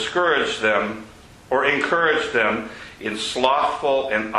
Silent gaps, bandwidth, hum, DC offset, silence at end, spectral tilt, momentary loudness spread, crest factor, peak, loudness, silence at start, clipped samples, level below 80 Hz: none; 12 kHz; none; under 0.1%; 0 s; -3.5 dB/octave; 10 LU; 18 dB; -4 dBFS; -20 LUFS; 0 s; under 0.1%; -54 dBFS